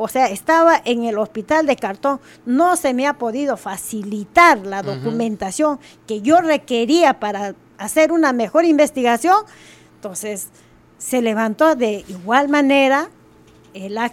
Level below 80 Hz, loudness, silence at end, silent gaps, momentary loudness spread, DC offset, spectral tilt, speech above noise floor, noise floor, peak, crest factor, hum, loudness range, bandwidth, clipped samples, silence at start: -58 dBFS; -17 LUFS; 0 s; none; 14 LU; under 0.1%; -4 dB/octave; 31 dB; -48 dBFS; 0 dBFS; 16 dB; none; 3 LU; 16.5 kHz; under 0.1%; 0 s